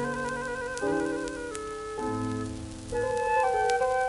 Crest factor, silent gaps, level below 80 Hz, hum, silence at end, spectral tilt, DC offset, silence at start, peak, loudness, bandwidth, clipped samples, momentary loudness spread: 20 dB; none; -50 dBFS; none; 0 s; -5 dB/octave; under 0.1%; 0 s; -10 dBFS; -30 LUFS; 11.5 kHz; under 0.1%; 10 LU